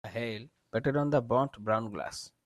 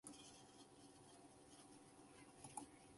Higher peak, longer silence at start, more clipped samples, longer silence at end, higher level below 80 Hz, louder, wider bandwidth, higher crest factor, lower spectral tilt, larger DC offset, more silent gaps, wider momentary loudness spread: first, -14 dBFS vs -36 dBFS; about the same, 0.05 s vs 0.05 s; neither; first, 0.15 s vs 0 s; first, -64 dBFS vs -84 dBFS; first, -32 LUFS vs -62 LUFS; first, 13 kHz vs 11.5 kHz; second, 18 dB vs 28 dB; first, -6.5 dB/octave vs -3 dB/octave; neither; neither; about the same, 11 LU vs 9 LU